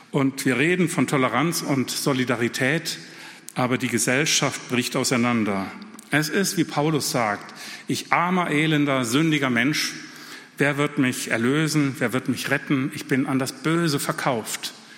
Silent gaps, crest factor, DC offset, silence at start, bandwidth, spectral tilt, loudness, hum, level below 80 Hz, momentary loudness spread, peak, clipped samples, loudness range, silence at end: none; 20 dB; under 0.1%; 0 s; 17 kHz; -4 dB/octave; -22 LUFS; none; -68 dBFS; 9 LU; -4 dBFS; under 0.1%; 1 LU; 0 s